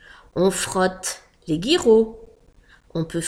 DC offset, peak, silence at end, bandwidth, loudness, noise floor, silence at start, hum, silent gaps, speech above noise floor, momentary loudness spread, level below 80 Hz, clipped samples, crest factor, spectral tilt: under 0.1%; -4 dBFS; 0 s; 15.5 kHz; -21 LUFS; -53 dBFS; 0.35 s; none; none; 33 dB; 15 LU; -48 dBFS; under 0.1%; 18 dB; -4 dB/octave